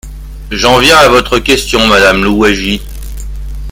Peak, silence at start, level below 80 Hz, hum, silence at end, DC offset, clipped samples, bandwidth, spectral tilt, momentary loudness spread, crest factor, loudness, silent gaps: 0 dBFS; 0.05 s; -22 dBFS; none; 0 s; under 0.1%; 1%; over 20 kHz; -3.5 dB/octave; 20 LU; 10 dB; -7 LUFS; none